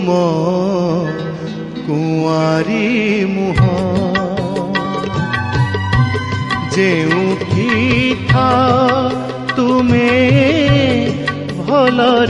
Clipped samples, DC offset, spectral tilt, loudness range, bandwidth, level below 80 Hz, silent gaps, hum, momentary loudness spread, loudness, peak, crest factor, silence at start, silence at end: under 0.1%; under 0.1%; -6.5 dB/octave; 4 LU; 11 kHz; -38 dBFS; none; none; 8 LU; -14 LUFS; 0 dBFS; 14 dB; 0 s; 0 s